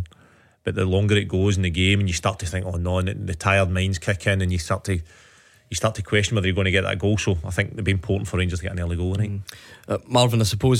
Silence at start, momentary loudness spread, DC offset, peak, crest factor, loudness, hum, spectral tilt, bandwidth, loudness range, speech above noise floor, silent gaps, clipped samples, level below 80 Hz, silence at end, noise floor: 0 s; 9 LU; under 0.1%; -4 dBFS; 18 dB; -23 LUFS; none; -5 dB/octave; 14.5 kHz; 2 LU; 33 dB; none; under 0.1%; -40 dBFS; 0 s; -55 dBFS